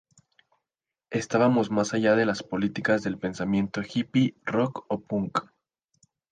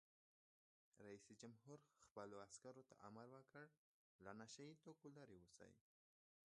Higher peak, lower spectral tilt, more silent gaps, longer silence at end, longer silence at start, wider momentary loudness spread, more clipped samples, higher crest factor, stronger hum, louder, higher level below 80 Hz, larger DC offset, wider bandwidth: first, -10 dBFS vs -42 dBFS; first, -6 dB/octave vs -4.5 dB/octave; second, none vs 2.11-2.15 s, 3.78-4.19 s; first, 0.9 s vs 0.7 s; first, 1.1 s vs 0.95 s; about the same, 9 LU vs 8 LU; neither; second, 18 dB vs 24 dB; neither; first, -26 LUFS vs -63 LUFS; first, -62 dBFS vs under -90 dBFS; neither; second, 9.4 kHz vs 11 kHz